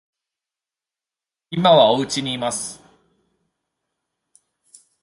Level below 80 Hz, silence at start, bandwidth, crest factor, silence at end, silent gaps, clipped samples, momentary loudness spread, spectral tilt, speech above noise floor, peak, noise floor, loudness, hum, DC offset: -62 dBFS; 1.5 s; 11.5 kHz; 22 dB; 2.3 s; none; under 0.1%; 16 LU; -4 dB/octave; 72 dB; -2 dBFS; -89 dBFS; -18 LUFS; none; under 0.1%